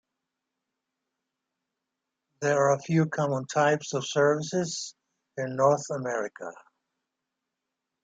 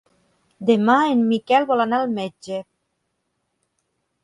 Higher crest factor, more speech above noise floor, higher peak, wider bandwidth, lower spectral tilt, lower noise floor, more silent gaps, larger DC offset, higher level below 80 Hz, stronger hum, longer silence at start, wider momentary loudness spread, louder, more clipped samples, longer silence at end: about the same, 20 dB vs 18 dB; first, 59 dB vs 55 dB; second, -10 dBFS vs -4 dBFS; second, 9.4 kHz vs 11 kHz; about the same, -5 dB/octave vs -6 dB/octave; first, -85 dBFS vs -74 dBFS; neither; neither; about the same, -74 dBFS vs -70 dBFS; neither; first, 2.4 s vs 0.6 s; about the same, 12 LU vs 14 LU; second, -27 LUFS vs -19 LUFS; neither; about the same, 1.5 s vs 1.6 s